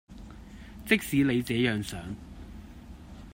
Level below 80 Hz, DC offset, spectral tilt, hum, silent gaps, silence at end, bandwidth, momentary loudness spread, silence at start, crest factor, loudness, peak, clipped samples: -50 dBFS; under 0.1%; -5.5 dB/octave; none; none; 0 s; 16 kHz; 22 LU; 0.1 s; 22 dB; -27 LUFS; -10 dBFS; under 0.1%